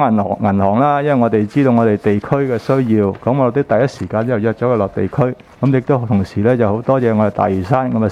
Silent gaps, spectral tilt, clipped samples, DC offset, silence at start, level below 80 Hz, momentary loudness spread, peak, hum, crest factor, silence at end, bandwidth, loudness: none; -9 dB/octave; under 0.1%; under 0.1%; 0 s; -48 dBFS; 4 LU; 0 dBFS; none; 14 dB; 0 s; 9.8 kHz; -15 LUFS